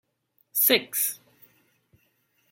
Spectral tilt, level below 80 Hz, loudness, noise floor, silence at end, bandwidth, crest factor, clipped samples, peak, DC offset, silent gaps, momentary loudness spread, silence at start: -0.5 dB/octave; -80 dBFS; -23 LUFS; -71 dBFS; 1.35 s; 16.5 kHz; 26 dB; under 0.1%; -4 dBFS; under 0.1%; none; 11 LU; 0.55 s